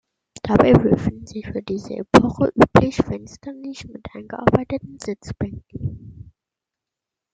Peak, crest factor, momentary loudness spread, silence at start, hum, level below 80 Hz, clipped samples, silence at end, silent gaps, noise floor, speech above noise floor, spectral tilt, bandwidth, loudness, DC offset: -2 dBFS; 20 dB; 19 LU; 0.45 s; none; -42 dBFS; under 0.1%; 1.2 s; none; -86 dBFS; 66 dB; -7 dB/octave; 9.2 kHz; -19 LUFS; under 0.1%